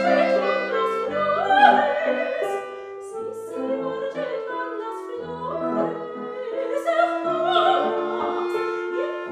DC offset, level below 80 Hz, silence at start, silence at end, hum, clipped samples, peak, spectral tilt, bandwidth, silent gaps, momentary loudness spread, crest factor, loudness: under 0.1%; -68 dBFS; 0 s; 0 s; none; under 0.1%; -2 dBFS; -5 dB/octave; 13.5 kHz; none; 13 LU; 22 dB; -23 LUFS